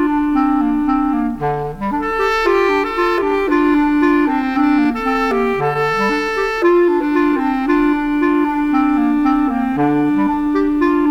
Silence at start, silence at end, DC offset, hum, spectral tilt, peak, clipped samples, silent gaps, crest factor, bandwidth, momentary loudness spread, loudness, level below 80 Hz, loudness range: 0 s; 0 s; under 0.1%; none; -6.5 dB/octave; -4 dBFS; under 0.1%; none; 12 dB; 7.8 kHz; 4 LU; -16 LUFS; -38 dBFS; 1 LU